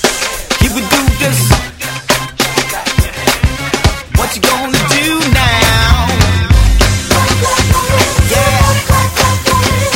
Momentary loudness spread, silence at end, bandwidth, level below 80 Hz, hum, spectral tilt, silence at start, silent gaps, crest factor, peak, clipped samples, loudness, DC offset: 5 LU; 0 s; 17 kHz; -18 dBFS; none; -4 dB/octave; 0 s; none; 10 dB; 0 dBFS; 0.2%; -11 LUFS; under 0.1%